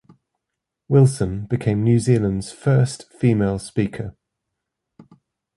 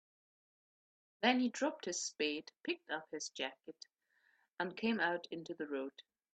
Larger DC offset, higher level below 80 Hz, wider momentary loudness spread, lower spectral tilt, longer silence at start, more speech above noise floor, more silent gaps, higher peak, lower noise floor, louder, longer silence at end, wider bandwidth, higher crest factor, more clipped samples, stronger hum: neither; first, -46 dBFS vs -86 dBFS; second, 9 LU vs 14 LU; first, -7.5 dB/octave vs -2.5 dB/octave; second, 0.9 s vs 1.2 s; first, 63 dB vs 37 dB; neither; first, -4 dBFS vs -14 dBFS; first, -82 dBFS vs -76 dBFS; first, -20 LUFS vs -39 LUFS; first, 1.45 s vs 0.3 s; first, 11.5 kHz vs 9 kHz; second, 18 dB vs 26 dB; neither; neither